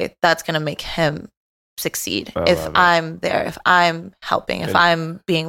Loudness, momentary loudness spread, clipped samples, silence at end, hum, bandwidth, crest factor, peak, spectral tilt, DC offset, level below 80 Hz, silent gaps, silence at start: -18 LUFS; 10 LU; under 0.1%; 0 s; none; 17 kHz; 18 dB; 0 dBFS; -4 dB/octave; under 0.1%; -46 dBFS; 1.37-1.77 s; 0 s